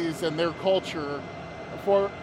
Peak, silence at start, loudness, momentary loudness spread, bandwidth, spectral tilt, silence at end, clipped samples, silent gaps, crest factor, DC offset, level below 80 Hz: -12 dBFS; 0 s; -27 LUFS; 14 LU; 15 kHz; -5.5 dB/octave; 0 s; under 0.1%; none; 16 dB; under 0.1%; -58 dBFS